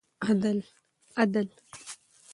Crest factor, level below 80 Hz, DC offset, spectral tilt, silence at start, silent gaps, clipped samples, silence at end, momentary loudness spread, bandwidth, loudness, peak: 22 dB; -72 dBFS; under 0.1%; -6 dB/octave; 0.2 s; none; under 0.1%; 0 s; 18 LU; 11.5 kHz; -29 LUFS; -10 dBFS